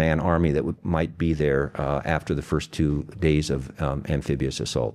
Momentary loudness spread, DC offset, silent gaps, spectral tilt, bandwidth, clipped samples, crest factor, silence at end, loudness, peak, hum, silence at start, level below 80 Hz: 5 LU; under 0.1%; none; -6.5 dB/octave; 12.5 kHz; under 0.1%; 18 dB; 0 s; -25 LUFS; -6 dBFS; none; 0 s; -36 dBFS